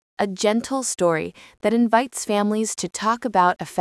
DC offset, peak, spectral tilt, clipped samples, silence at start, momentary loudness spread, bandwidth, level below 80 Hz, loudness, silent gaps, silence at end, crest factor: under 0.1%; -4 dBFS; -4 dB/octave; under 0.1%; 0.2 s; 7 LU; 12 kHz; -64 dBFS; -21 LUFS; none; 0 s; 16 dB